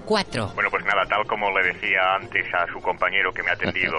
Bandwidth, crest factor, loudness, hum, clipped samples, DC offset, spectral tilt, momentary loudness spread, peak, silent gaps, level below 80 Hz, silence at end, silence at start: 11.5 kHz; 16 dB; -22 LUFS; none; under 0.1%; under 0.1%; -4 dB/octave; 4 LU; -6 dBFS; none; -48 dBFS; 0 s; 0 s